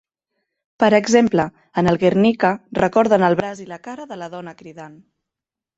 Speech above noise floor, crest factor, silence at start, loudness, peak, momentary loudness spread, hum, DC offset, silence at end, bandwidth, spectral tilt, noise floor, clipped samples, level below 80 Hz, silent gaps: 69 dB; 18 dB; 0.8 s; -17 LUFS; -2 dBFS; 18 LU; none; under 0.1%; 0.9 s; 8 kHz; -6 dB/octave; -87 dBFS; under 0.1%; -54 dBFS; none